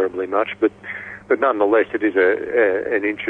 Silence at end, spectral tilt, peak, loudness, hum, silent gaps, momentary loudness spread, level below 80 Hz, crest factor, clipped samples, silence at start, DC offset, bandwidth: 0 s; -7 dB/octave; -6 dBFS; -19 LUFS; none; none; 7 LU; -60 dBFS; 14 dB; under 0.1%; 0 s; under 0.1%; 4.2 kHz